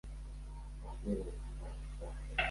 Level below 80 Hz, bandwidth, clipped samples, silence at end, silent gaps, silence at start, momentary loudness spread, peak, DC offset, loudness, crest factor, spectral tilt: -44 dBFS; 11.5 kHz; under 0.1%; 0 s; none; 0.05 s; 10 LU; -20 dBFS; under 0.1%; -44 LUFS; 22 dB; -5.5 dB/octave